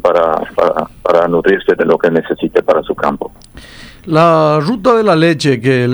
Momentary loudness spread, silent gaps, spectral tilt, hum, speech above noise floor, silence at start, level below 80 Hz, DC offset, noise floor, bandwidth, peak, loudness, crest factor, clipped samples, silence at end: 7 LU; none; -6.5 dB/octave; none; 24 dB; 0.05 s; -42 dBFS; under 0.1%; -35 dBFS; over 20 kHz; 0 dBFS; -12 LUFS; 12 dB; under 0.1%; 0 s